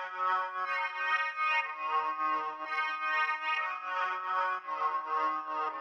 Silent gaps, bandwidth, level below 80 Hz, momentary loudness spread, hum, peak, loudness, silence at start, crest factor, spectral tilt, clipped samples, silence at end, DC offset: none; 7.2 kHz; under -90 dBFS; 4 LU; none; -16 dBFS; -32 LUFS; 0 s; 16 dB; -1 dB/octave; under 0.1%; 0 s; under 0.1%